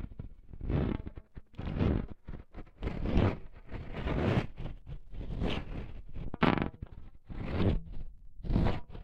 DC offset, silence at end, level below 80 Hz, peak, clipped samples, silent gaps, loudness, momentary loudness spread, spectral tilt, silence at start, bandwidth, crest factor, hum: under 0.1%; 0 s; -40 dBFS; -8 dBFS; under 0.1%; none; -34 LUFS; 19 LU; -8.5 dB/octave; 0 s; 7.4 kHz; 26 dB; none